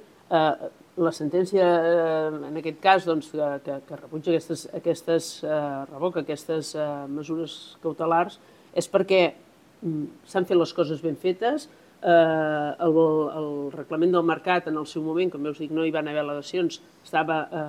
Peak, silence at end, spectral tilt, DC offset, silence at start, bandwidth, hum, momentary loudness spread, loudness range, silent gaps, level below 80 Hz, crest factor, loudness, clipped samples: -4 dBFS; 0 s; -5.5 dB/octave; under 0.1%; 0.3 s; 14.5 kHz; none; 11 LU; 5 LU; none; -74 dBFS; 20 dB; -25 LUFS; under 0.1%